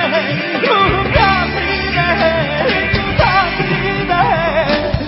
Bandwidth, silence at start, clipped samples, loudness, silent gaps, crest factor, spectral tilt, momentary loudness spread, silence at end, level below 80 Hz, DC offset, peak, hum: 5.8 kHz; 0 s; under 0.1%; -14 LUFS; none; 14 dB; -9 dB/octave; 4 LU; 0 s; -28 dBFS; under 0.1%; 0 dBFS; none